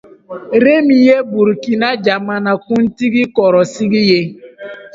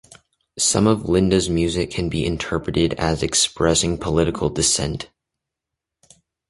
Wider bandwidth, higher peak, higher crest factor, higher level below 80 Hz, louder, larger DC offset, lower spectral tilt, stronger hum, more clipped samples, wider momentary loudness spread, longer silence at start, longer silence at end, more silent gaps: second, 7.8 kHz vs 11.5 kHz; about the same, 0 dBFS vs -2 dBFS; second, 12 dB vs 18 dB; second, -56 dBFS vs -38 dBFS; first, -12 LUFS vs -19 LUFS; neither; first, -6 dB/octave vs -4 dB/octave; neither; neither; first, 19 LU vs 6 LU; second, 0.3 s vs 0.55 s; second, 0.05 s vs 1.45 s; neither